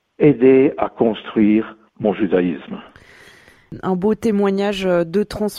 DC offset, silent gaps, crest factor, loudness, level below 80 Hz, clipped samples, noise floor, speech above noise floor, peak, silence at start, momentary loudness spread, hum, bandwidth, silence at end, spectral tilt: under 0.1%; none; 16 dB; -17 LUFS; -48 dBFS; under 0.1%; -47 dBFS; 30 dB; -2 dBFS; 0.2 s; 13 LU; none; 14.5 kHz; 0 s; -7.5 dB/octave